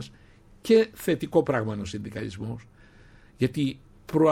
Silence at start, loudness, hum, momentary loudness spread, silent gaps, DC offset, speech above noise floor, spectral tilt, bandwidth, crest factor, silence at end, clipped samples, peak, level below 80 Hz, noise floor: 0 s; -26 LUFS; none; 18 LU; none; under 0.1%; 28 dB; -6.5 dB/octave; 16.5 kHz; 18 dB; 0 s; under 0.1%; -8 dBFS; -56 dBFS; -54 dBFS